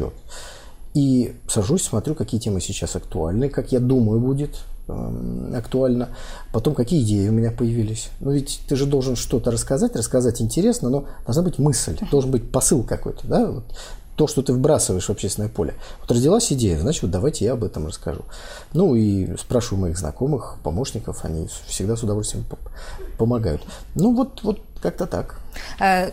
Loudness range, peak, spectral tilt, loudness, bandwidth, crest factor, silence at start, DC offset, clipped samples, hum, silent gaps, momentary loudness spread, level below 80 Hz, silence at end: 4 LU; -4 dBFS; -5.5 dB/octave; -22 LUFS; 16 kHz; 16 dB; 0 s; under 0.1%; under 0.1%; none; none; 13 LU; -34 dBFS; 0 s